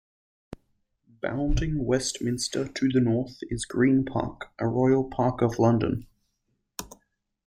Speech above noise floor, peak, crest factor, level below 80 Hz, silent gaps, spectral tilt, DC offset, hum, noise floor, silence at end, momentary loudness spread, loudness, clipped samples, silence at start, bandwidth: 51 dB; -8 dBFS; 18 dB; -40 dBFS; none; -6 dB/octave; under 0.1%; none; -76 dBFS; 0.6 s; 13 LU; -26 LUFS; under 0.1%; 0.5 s; 16 kHz